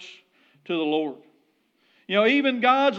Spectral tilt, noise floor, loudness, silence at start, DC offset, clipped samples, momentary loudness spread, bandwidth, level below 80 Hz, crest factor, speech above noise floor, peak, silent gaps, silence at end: -5.5 dB/octave; -67 dBFS; -23 LUFS; 0 s; under 0.1%; under 0.1%; 13 LU; 7.6 kHz; under -90 dBFS; 18 dB; 45 dB; -6 dBFS; none; 0 s